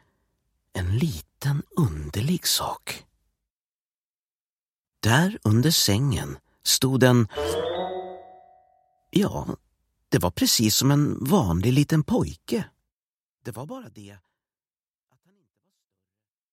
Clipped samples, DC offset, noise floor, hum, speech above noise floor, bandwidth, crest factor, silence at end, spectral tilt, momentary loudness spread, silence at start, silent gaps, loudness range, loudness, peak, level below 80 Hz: under 0.1%; under 0.1%; under -90 dBFS; none; over 67 dB; 16.5 kHz; 22 dB; 2.4 s; -4.5 dB/octave; 18 LU; 0.75 s; 3.50-4.85 s, 12.92-13.36 s; 11 LU; -23 LUFS; -2 dBFS; -48 dBFS